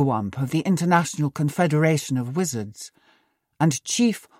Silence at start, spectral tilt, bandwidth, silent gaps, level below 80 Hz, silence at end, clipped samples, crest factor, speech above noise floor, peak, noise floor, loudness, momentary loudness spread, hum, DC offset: 0 s; -5.5 dB/octave; 16 kHz; none; -64 dBFS; 0.2 s; under 0.1%; 16 dB; 43 dB; -6 dBFS; -65 dBFS; -23 LUFS; 10 LU; none; under 0.1%